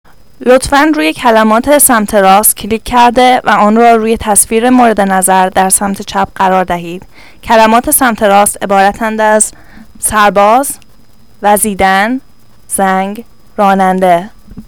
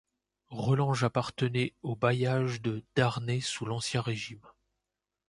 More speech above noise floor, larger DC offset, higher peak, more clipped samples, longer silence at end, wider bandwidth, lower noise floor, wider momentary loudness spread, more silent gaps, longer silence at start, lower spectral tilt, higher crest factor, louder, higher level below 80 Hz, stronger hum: second, 36 dB vs 58 dB; first, 1% vs under 0.1%; first, 0 dBFS vs -10 dBFS; first, 2% vs under 0.1%; second, 0.05 s vs 0.8 s; first, over 20 kHz vs 11.5 kHz; second, -44 dBFS vs -88 dBFS; about the same, 10 LU vs 8 LU; neither; about the same, 0.4 s vs 0.5 s; second, -3.5 dB/octave vs -5.5 dB/octave; second, 10 dB vs 20 dB; first, -8 LUFS vs -31 LUFS; first, -36 dBFS vs -62 dBFS; neither